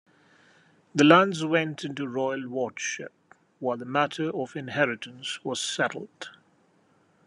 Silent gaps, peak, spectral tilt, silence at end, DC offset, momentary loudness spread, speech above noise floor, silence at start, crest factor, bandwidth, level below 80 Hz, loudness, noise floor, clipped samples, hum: none; -2 dBFS; -4.5 dB/octave; 0.95 s; under 0.1%; 17 LU; 38 dB; 0.95 s; 26 dB; 11.5 kHz; -78 dBFS; -26 LUFS; -64 dBFS; under 0.1%; none